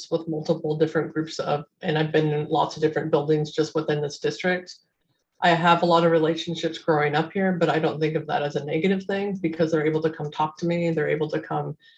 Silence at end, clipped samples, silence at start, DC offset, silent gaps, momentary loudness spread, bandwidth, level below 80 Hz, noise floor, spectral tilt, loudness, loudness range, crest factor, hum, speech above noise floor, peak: 0.25 s; under 0.1%; 0 s; under 0.1%; none; 8 LU; 8.2 kHz; -66 dBFS; -73 dBFS; -6.5 dB/octave; -24 LUFS; 3 LU; 18 dB; none; 49 dB; -6 dBFS